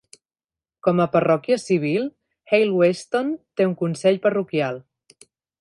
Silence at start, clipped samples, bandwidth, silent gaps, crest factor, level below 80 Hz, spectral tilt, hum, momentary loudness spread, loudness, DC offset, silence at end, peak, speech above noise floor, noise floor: 0.85 s; under 0.1%; 11.5 kHz; none; 16 dB; -68 dBFS; -6.5 dB/octave; none; 7 LU; -21 LUFS; under 0.1%; 0.8 s; -6 dBFS; over 70 dB; under -90 dBFS